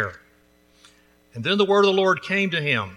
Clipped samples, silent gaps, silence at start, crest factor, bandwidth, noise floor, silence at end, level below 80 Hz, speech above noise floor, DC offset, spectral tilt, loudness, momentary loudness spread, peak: under 0.1%; none; 0 s; 18 dB; 11.5 kHz; -58 dBFS; 0 s; -64 dBFS; 38 dB; under 0.1%; -5 dB/octave; -20 LUFS; 12 LU; -6 dBFS